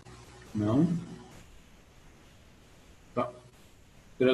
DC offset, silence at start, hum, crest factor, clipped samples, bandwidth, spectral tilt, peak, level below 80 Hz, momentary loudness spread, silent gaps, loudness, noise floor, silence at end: under 0.1%; 0.1 s; none; 22 dB; under 0.1%; 12.5 kHz; -7.5 dB/octave; -10 dBFS; -58 dBFS; 25 LU; none; -31 LUFS; -57 dBFS; 0 s